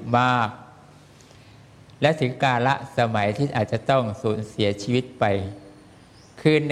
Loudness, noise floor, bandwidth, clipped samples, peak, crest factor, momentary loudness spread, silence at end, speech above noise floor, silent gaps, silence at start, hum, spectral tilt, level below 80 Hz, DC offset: -23 LUFS; -49 dBFS; 12 kHz; under 0.1%; -4 dBFS; 20 dB; 7 LU; 0 s; 27 dB; none; 0 s; none; -6.5 dB/octave; -58 dBFS; under 0.1%